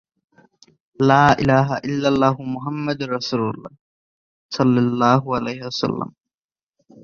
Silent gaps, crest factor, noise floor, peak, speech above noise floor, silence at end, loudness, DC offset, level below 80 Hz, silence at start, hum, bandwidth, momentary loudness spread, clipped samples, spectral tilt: 3.79-4.49 s; 20 dB; under -90 dBFS; -2 dBFS; over 71 dB; 0.95 s; -19 LUFS; under 0.1%; -52 dBFS; 1 s; none; 7.4 kHz; 12 LU; under 0.1%; -6.5 dB/octave